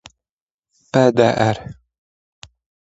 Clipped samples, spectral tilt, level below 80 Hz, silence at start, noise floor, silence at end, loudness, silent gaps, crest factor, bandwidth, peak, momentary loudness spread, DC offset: under 0.1%; -6.5 dB/octave; -52 dBFS; 0.95 s; under -90 dBFS; 1.2 s; -17 LUFS; none; 20 dB; 8 kHz; 0 dBFS; 15 LU; under 0.1%